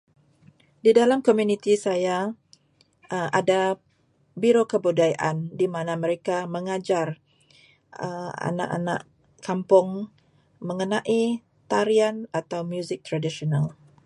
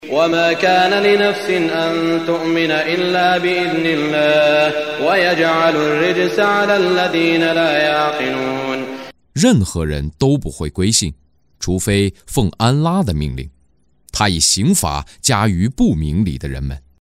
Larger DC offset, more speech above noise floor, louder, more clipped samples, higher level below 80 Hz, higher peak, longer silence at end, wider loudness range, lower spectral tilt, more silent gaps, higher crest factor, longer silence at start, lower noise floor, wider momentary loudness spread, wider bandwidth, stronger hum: neither; about the same, 41 dB vs 43 dB; second, -24 LUFS vs -15 LUFS; neither; second, -70 dBFS vs -34 dBFS; second, -4 dBFS vs 0 dBFS; first, 0.35 s vs 0.2 s; about the same, 5 LU vs 4 LU; first, -6 dB/octave vs -4.5 dB/octave; neither; about the same, 20 dB vs 16 dB; first, 0.85 s vs 0 s; first, -64 dBFS vs -59 dBFS; first, 13 LU vs 9 LU; second, 11.5 kHz vs 16 kHz; neither